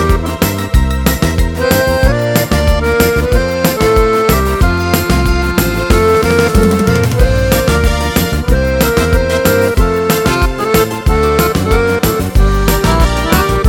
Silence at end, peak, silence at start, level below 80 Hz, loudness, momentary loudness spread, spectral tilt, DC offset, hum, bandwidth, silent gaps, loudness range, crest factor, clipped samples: 0 s; 0 dBFS; 0 s; -16 dBFS; -12 LUFS; 3 LU; -5.5 dB/octave; under 0.1%; none; 18.5 kHz; none; 1 LU; 10 dB; 0.1%